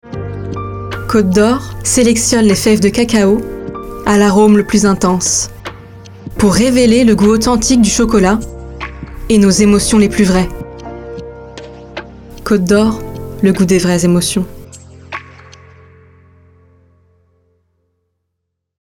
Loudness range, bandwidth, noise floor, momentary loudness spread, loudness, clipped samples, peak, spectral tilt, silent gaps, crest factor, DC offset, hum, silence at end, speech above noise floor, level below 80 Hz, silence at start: 5 LU; 17 kHz; -73 dBFS; 19 LU; -11 LUFS; under 0.1%; 0 dBFS; -5 dB/octave; none; 14 dB; under 0.1%; none; 3.75 s; 63 dB; -32 dBFS; 0.05 s